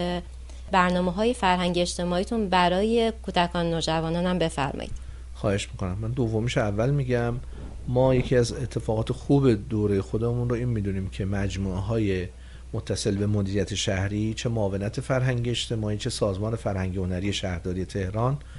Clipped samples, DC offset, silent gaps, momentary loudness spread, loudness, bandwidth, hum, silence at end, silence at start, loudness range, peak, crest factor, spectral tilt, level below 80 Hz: under 0.1%; under 0.1%; none; 9 LU; -26 LUFS; 11.5 kHz; none; 0 s; 0 s; 4 LU; -8 dBFS; 18 dB; -6 dB/octave; -40 dBFS